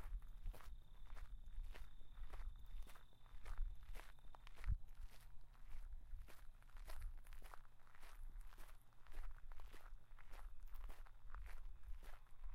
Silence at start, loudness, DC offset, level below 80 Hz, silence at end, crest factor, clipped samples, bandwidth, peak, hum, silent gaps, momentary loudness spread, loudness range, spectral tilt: 0 s; -60 LUFS; under 0.1%; -52 dBFS; 0 s; 18 dB; under 0.1%; 15 kHz; -32 dBFS; none; none; 10 LU; 6 LU; -5 dB/octave